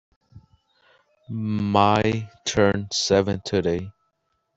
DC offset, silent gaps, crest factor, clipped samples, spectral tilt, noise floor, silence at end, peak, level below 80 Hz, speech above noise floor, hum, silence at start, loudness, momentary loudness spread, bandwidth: under 0.1%; none; 20 dB; under 0.1%; -5 dB/octave; -73 dBFS; 0.65 s; -4 dBFS; -52 dBFS; 51 dB; none; 0.35 s; -22 LUFS; 11 LU; 8.2 kHz